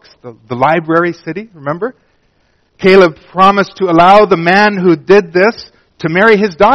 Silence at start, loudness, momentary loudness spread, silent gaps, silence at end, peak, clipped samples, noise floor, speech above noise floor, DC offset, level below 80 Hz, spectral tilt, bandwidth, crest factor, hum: 0.25 s; -9 LUFS; 15 LU; none; 0 s; 0 dBFS; 0.8%; -56 dBFS; 46 dB; under 0.1%; -46 dBFS; -6.5 dB/octave; 8 kHz; 10 dB; none